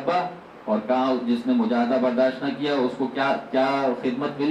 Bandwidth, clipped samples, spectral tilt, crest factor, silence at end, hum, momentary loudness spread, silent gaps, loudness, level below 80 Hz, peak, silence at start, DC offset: 8.4 kHz; under 0.1%; -6.5 dB/octave; 12 dB; 0 s; none; 5 LU; none; -23 LUFS; -68 dBFS; -10 dBFS; 0 s; under 0.1%